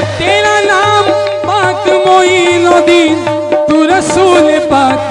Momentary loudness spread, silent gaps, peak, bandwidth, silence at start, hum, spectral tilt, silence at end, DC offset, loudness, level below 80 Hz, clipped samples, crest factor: 5 LU; none; 0 dBFS; 11 kHz; 0 s; none; -4 dB/octave; 0 s; under 0.1%; -8 LUFS; -42 dBFS; 0.5%; 8 dB